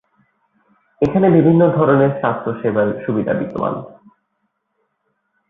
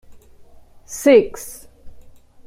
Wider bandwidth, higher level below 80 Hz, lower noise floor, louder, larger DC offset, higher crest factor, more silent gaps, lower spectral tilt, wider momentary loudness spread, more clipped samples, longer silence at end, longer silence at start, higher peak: second, 4.7 kHz vs 16 kHz; about the same, -50 dBFS vs -48 dBFS; first, -71 dBFS vs -44 dBFS; about the same, -16 LUFS vs -15 LUFS; neither; about the same, 16 dB vs 20 dB; neither; first, -10.5 dB/octave vs -4 dB/octave; second, 10 LU vs 22 LU; neither; first, 1.6 s vs 0.6 s; about the same, 1 s vs 0.9 s; about the same, -2 dBFS vs -2 dBFS